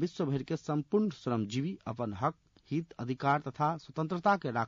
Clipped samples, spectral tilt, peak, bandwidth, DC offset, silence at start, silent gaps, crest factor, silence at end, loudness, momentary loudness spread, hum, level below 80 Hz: under 0.1%; -6.5 dB/octave; -16 dBFS; 7.4 kHz; under 0.1%; 0 s; none; 16 dB; 0 s; -33 LUFS; 8 LU; none; -68 dBFS